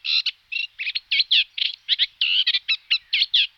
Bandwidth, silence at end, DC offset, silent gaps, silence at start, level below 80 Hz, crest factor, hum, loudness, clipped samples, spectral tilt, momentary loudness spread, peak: 13 kHz; 0.1 s; under 0.1%; none; 0.05 s; -72 dBFS; 16 dB; none; -20 LUFS; under 0.1%; 5 dB/octave; 8 LU; -6 dBFS